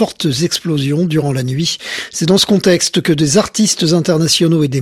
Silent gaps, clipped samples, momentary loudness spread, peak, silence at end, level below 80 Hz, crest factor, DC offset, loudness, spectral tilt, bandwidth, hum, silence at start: none; under 0.1%; 6 LU; 0 dBFS; 0 s; -48 dBFS; 12 dB; under 0.1%; -13 LUFS; -4.5 dB/octave; 14 kHz; none; 0 s